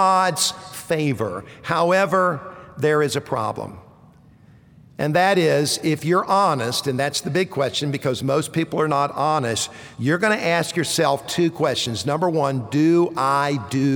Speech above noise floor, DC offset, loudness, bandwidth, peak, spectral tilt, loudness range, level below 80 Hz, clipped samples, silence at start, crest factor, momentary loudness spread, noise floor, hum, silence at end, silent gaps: 29 dB; under 0.1%; -20 LUFS; over 20 kHz; -4 dBFS; -4.5 dB/octave; 2 LU; -60 dBFS; under 0.1%; 0 s; 16 dB; 8 LU; -49 dBFS; none; 0 s; none